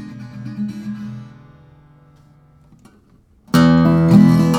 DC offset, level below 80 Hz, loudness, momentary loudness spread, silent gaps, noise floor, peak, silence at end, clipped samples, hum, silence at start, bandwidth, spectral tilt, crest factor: under 0.1%; -48 dBFS; -14 LUFS; 22 LU; none; -52 dBFS; 0 dBFS; 0 s; under 0.1%; none; 0 s; 15 kHz; -7.5 dB/octave; 16 dB